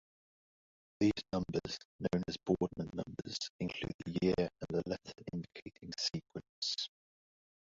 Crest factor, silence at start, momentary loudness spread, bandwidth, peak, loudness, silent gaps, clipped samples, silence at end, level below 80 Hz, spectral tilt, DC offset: 20 dB; 1 s; 11 LU; 7.6 kHz; -18 dBFS; -38 LUFS; 1.85-1.99 s, 3.50-3.59 s, 3.94-3.99 s, 5.62-5.66 s, 6.49-6.62 s; under 0.1%; 0.85 s; -62 dBFS; -5 dB/octave; under 0.1%